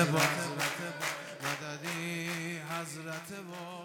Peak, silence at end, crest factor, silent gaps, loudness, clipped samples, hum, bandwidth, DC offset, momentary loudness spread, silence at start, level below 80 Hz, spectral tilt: -12 dBFS; 0 s; 22 dB; none; -35 LUFS; under 0.1%; none; 19.5 kHz; under 0.1%; 12 LU; 0 s; -80 dBFS; -3.5 dB/octave